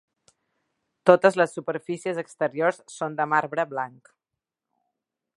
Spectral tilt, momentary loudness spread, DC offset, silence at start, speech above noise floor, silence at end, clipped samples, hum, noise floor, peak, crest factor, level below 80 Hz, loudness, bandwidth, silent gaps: -5.5 dB/octave; 14 LU; under 0.1%; 1.05 s; 63 dB; 1.5 s; under 0.1%; none; -87 dBFS; 0 dBFS; 26 dB; -76 dBFS; -24 LUFS; 11.5 kHz; none